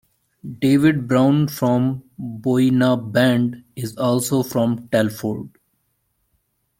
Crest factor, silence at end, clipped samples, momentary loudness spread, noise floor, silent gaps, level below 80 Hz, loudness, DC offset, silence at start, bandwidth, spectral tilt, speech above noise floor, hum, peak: 16 dB; 1.3 s; under 0.1%; 15 LU; -69 dBFS; none; -58 dBFS; -19 LUFS; under 0.1%; 0.45 s; 17 kHz; -6.5 dB/octave; 51 dB; none; -2 dBFS